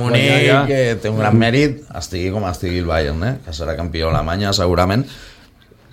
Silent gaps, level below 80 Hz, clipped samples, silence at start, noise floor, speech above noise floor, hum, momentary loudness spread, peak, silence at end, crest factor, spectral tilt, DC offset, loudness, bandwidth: none; -32 dBFS; under 0.1%; 0 s; -47 dBFS; 31 dB; none; 11 LU; 0 dBFS; 0.6 s; 16 dB; -6 dB/octave; under 0.1%; -17 LUFS; 16 kHz